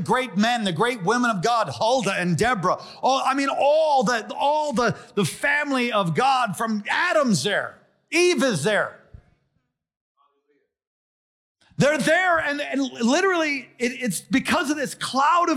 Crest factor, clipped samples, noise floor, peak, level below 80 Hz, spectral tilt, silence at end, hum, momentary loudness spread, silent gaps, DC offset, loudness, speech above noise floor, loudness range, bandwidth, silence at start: 14 dB; under 0.1%; -74 dBFS; -10 dBFS; -60 dBFS; -4.5 dB/octave; 0 s; none; 7 LU; 9.97-10.15 s, 10.87-11.55 s; under 0.1%; -22 LUFS; 52 dB; 4 LU; 16 kHz; 0 s